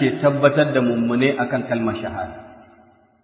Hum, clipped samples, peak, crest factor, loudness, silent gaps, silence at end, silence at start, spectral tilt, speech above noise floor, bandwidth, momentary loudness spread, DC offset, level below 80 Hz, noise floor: none; under 0.1%; 0 dBFS; 20 dB; -20 LUFS; none; 0.7 s; 0 s; -10.5 dB/octave; 34 dB; 4 kHz; 14 LU; under 0.1%; -52 dBFS; -53 dBFS